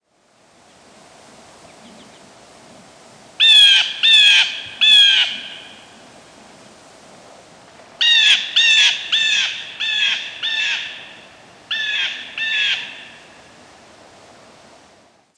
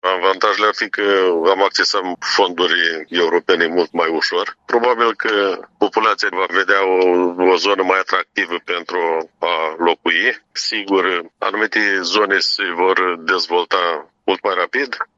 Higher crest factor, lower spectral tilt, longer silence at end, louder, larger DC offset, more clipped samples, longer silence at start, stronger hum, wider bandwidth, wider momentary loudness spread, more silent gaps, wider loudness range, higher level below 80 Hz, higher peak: about the same, 16 dB vs 16 dB; second, 2.5 dB/octave vs -2 dB/octave; first, 2.3 s vs 0.15 s; first, -12 LUFS vs -16 LUFS; neither; neither; first, 3.4 s vs 0.05 s; neither; first, 11 kHz vs 7.8 kHz; first, 17 LU vs 6 LU; neither; first, 12 LU vs 2 LU; about the same, -70 dBFS vs -68 dBFS; about the same, -2 dBFS vs 0 dBFS